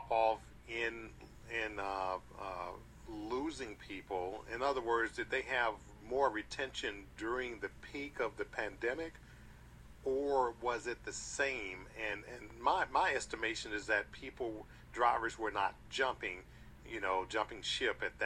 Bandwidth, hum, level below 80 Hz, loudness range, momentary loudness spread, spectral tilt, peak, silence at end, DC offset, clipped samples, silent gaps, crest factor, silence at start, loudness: 14.5 kHz; none; -60 dBFS; 5 LU; 14 LU; -3 dB/octave; -18 dBFS; 0 s; under 0.1%; under 0.1%; none; 22 dB; 0 s; -38 LUFS